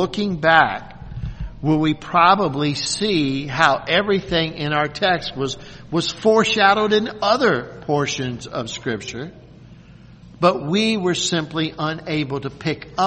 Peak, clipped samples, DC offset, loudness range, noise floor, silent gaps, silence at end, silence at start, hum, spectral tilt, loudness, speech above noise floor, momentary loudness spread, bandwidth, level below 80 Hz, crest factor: 0 dBFS; under 0.1%; under 0.1%; 5 LU; -44 dBFS; none; 0 s; 0 s; none; -4.5 dB/octave; -19 LUFS; 24 dB; 13 LU; 8.8 kHz; -44 dBFS; 20 dB